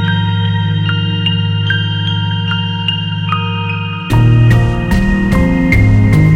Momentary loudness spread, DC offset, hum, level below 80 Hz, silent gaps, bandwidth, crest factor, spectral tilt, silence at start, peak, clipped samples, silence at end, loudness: 7 LU; under 0.1%; none; -22 dBFS; none; 9.6 kHz; 12 dB; -7 dB/octave; 0 s; 0 dBFS; under 0.1%; 0 s; -13 LUFS